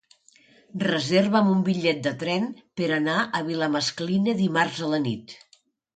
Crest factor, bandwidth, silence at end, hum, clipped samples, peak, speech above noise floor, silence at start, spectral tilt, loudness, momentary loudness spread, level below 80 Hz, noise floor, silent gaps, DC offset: 18 dB; 9.2 kHz; 0.6 s; none; under 0.1%; -8 dBFS; 34 dB; 0.75 s; -5.5 dB/octave; -24 LUFS; 9 LU; -68 dBFS; -58 dBFS; none; under 0.1%